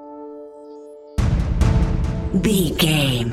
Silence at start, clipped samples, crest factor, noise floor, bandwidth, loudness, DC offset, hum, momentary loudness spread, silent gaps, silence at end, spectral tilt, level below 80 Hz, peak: 0 s; under 0.1%; 16 dB; -39 dBFS; 16.5 kHz; -20 LUFS; under 0.1%; none; 21 LU; none; 0 s; -5.5 dB/octave; -24 dBFS; -4 dBFS